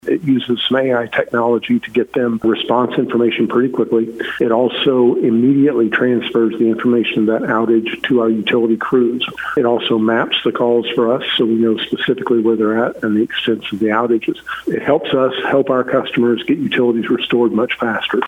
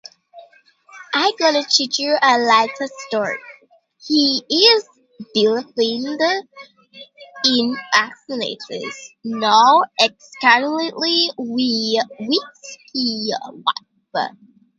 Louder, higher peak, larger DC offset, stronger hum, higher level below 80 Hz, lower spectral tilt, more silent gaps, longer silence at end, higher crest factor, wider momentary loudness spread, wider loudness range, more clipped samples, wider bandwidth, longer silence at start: about the same, -15 LUFS vs -17 LUFS; about the same, 0 dBFS vs 0 dBFS; neither; neither; first, -58 dBFS vs -72 dBFS; first, -7 dB/octave vs -2 dB/octave; neither; second, 0 s vs 0.5 s; second, 14 dB vs 20 dB; second, 4 LU vs 14 LU; second, 2 LU vs 5 LU; neither; second, 4.1 kHz vs 9 kHz; second, 0.05 s vs 0.35 s